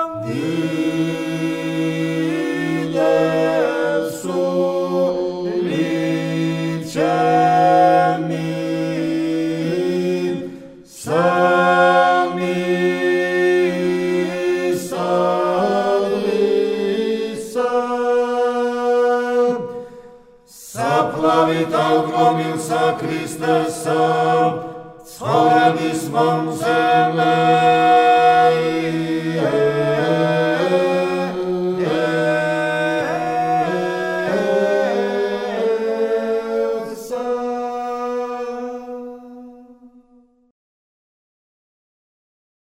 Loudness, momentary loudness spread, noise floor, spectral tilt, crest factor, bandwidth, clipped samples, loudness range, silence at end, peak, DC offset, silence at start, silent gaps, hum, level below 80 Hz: -18 LUFS; 10 LU; -54 dBFS; -6 dB/octave; 16 dB; 16 kHz; under 0.1%; 6 LU; 2.9 s; -2 dBFS; under 0.1%; 0 s; none; none; -60 dBFS